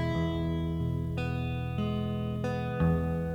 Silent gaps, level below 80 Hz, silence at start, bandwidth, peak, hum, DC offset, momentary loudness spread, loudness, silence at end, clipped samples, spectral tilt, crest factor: none; -44 dBFS; 0 s; 8 kHz; -16 dBFS; none; under 0.1%; 4 LU; -31 LUFS; 0 s; under 0.1%; -8.5 dB/octave; 14 dB